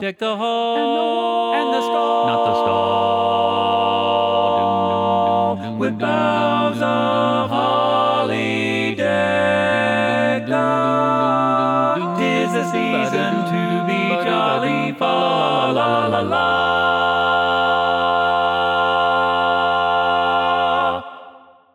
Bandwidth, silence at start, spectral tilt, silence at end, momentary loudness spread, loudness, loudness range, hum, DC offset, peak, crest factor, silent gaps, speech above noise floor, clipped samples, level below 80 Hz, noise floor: 12.5 kHz; 0 s; -5.5 dB/octave; 0.35 s; 3 LU; -18 LUFS; 1 LU; none; under 0.1%; -2 dBFS; 14 dB; none; 26 dB; under 0.1%; -58 dBFS; -44 dBFS